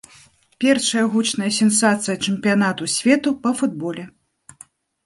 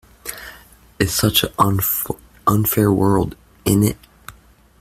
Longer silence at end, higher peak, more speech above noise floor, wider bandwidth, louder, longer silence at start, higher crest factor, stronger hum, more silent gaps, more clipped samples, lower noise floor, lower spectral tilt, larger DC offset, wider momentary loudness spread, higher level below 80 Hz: first, 0.95 s vs 0.5 s; about the same, -2 dBFS vs 0 dBFS; about the same, 33 dB vs 32 dB; second, 11.5 kHz vs 16 kHz; about the same, -19 LUFS vs -18 LUFS; first, 0.6 s vs 0.25 s; about the same, 18 dB vs 20 dB; neither; neither; neither; about the same, -51 dBFS vs -49 dBFS; second, -3.5 dB/octave vs -5 dB/octave; neither; second, 6 LU vs 16 LU; second, -64 dBFS vs -42 dBFS